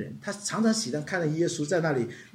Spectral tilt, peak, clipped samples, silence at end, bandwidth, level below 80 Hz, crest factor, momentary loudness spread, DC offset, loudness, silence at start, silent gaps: -4.5 dB/octave; -12 dBFS; under 0.1%; 0.05 s; 14.5 kHz; -72 dBFS; 16 dB; 6 LU; under 0.1%; -28 LUFS; 0 s; none